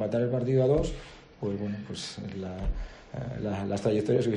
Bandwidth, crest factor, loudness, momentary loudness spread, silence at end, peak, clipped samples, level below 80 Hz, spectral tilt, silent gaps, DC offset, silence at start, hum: 11 kHz; 16 dB; -30 LUFS; 14 LU; 0 s; -12 dBFS; under 0.1%; -42 dBFS; -7 dB/octave; none; under 0.1%; 0 s; none